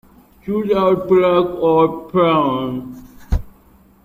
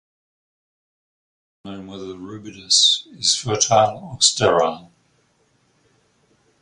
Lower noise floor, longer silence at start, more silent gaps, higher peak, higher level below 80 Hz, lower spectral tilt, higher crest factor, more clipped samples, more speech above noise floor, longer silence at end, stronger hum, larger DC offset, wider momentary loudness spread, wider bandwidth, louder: second, -49 dBFS vs -63 dBFS; second, 0.45 s vs 1.65 s; neither; about the same, -2 dBFS vs 0 dBFS; first, -32 dBFS vs -58 dBFS; first, -8.5 dB/octave vs -2 dB/octave; second, 16 dB vs 22 dB; neither; second, 34 dB vs 43 dB; second, 0.55 s vs 1.8 s; neither; neither; second, 11 LU vs 22 LU; first, 15.5 kHz vs 11.5 kHz; about the same, -17 LUFS vs -17 LUFS